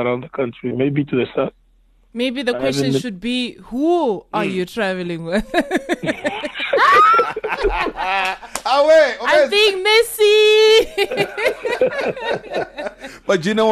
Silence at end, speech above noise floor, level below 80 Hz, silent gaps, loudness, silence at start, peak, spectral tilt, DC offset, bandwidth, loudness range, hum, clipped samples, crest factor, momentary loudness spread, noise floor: 0 s; 37 dB; -42 dBFS; none; -17 LUFS; 0 s; -4 dBFS; -4 dB/octave; under 0.1%; 13 kHz; 7 LU; none; under 0.1%; 14 dB; 12 LU; -54 dBFS